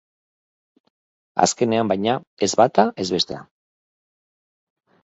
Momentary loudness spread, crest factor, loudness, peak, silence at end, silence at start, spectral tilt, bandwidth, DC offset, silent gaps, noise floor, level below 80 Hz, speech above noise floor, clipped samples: 8 LU; 24 dB; -20 LUFS; 0 dBFS; 1.6 s; 1.35 s; -4 dB/octave; 8.2 kHz; under 0.1%; 2.27-2.37 s; under -90 dBFS; -60 dBFS; over 70 dB; under 0.1%